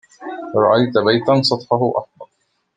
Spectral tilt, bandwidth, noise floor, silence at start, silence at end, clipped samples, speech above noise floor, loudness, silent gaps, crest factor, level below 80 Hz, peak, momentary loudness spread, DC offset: -6 dB/octave; 9.4 kHz; -67 dBFS; 0.2 s; 0.5 s; under 0.1%; 52 dB; -16 LUFS; none; 16 dB; -62 dBFS; -2 dBFS; 12 LU; under 0.1%